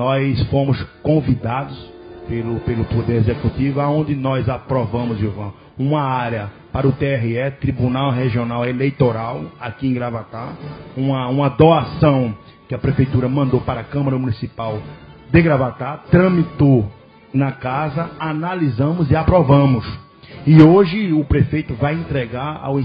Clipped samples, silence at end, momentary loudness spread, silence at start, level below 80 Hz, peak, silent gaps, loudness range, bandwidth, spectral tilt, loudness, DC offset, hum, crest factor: under 0.1%; 0 s; 14 LU; 0 s; -36 dBFS; 0 dBFS; none; 6 LU; 5.2 kHz; -10.5 dB/octave; -18 LUFS; under 0.1%; none; 18 dB